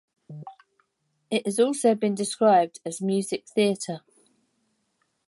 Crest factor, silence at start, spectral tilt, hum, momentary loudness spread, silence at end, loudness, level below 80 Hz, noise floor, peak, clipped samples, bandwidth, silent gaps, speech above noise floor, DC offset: 18 dB; 0.3 s; -4.5 dB/octave; none; 22 LU; 1.3 s; -24 LUFS; -80 dBFS; -74 dBFS; -8 dBFS; under 0.1%; 11.5 kHz; none; 50 dB; under 0.1%